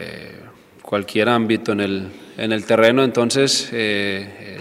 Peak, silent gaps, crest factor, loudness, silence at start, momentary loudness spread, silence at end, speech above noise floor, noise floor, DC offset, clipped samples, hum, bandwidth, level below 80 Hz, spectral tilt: 0 dBFS; none; 20 dB; -18 LUFS; 0 s; 18 LU; 0 s; 25 dB; -43 dBFS; under 0.1%; under 0.1%; none; 15.5 kHz; -64 dBFS; -4 dB/octave